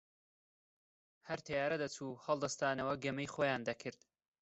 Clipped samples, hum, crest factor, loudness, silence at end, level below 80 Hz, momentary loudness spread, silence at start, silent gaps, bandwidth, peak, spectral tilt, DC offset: under 0.1%; none; 20 dB; -39 LUFS; 0.5 s; -74 dBFS; 9 LU; 1.25 s; none; 8.2 kHz; -20 dBFS; -4.5 dB/octave; under 0.1%